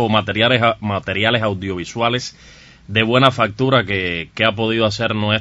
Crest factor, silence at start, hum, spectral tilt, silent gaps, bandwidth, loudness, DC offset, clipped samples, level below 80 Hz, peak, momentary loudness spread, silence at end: 18 dB; 0 s; none; -5.5 dB/octave; none; 8.2 kHz; -17 LUFS; under 0.1%; under 0.1%; -48 dBFS; 0 dBFS; 9 LU; 0 s